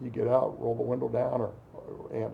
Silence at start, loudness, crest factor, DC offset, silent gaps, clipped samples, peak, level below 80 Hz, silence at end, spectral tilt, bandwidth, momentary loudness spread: 0 s; -30 LUFS; 18 dB; under 0.1%; none; under 0.1%; -12 dBFS; -60 dBFS; 0 s; -10 dB/octave; 5.2 kHz; 17 LU